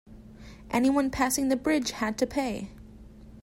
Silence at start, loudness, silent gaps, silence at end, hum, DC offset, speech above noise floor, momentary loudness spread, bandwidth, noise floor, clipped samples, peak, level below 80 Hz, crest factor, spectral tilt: 0.1 s; -27 LUFS; none; 0 s; none; under 0.1%; 21 dB; 21 LU; 16 kHz; -48 dBFS; under 0.1%; -12 dBFS; -50 dBFS; 16 dB; -3.5 dB/octave